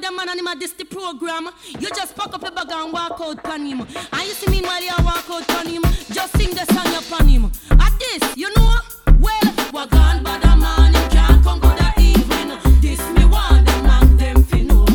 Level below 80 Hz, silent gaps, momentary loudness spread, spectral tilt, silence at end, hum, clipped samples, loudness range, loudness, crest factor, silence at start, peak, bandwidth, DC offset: -14 dBFS; none; 13 LU; -5.5 dB/octave; 0 s; none; under 0.1%; 11 LU; -17 LUFS; 14 dB; 0 s; 0 dBFS; 18.5 kHz; under 0.1%